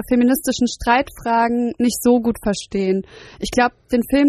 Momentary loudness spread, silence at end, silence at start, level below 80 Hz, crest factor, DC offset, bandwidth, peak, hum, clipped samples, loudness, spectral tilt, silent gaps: 6 LU; 0 s; 0 s; -42 dBFS; 16 dB; under 0.1%; 13.5 kHz; -2 dBFS; none; under 0.1%; -19 LUFS; -4.5 dB/octave; none